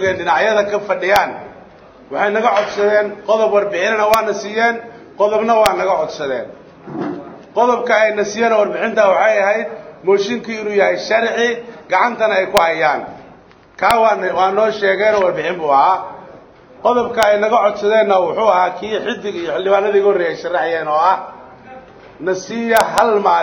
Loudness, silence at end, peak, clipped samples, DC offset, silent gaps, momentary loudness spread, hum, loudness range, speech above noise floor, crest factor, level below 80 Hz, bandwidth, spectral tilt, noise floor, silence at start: -15 LUFS; 0 s; 0 dBFS; under 0.1%; under 0.1%; none; 10 LU; none; 2 LU; 29 dB; 16 dB; -52 dBFS; 7 kHz; -2 dB/octave; -44 dBFS; 0 s